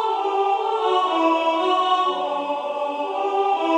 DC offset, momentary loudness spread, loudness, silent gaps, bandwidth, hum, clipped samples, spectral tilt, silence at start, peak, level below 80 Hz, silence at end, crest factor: under 0.1%; 6 LU; -21 LUFS; none; 10 kHz; none; under 0.1%; -2.5 dB/octave; 0 s; -8 dBFS; -80 dBFS; 0 s; 12 dB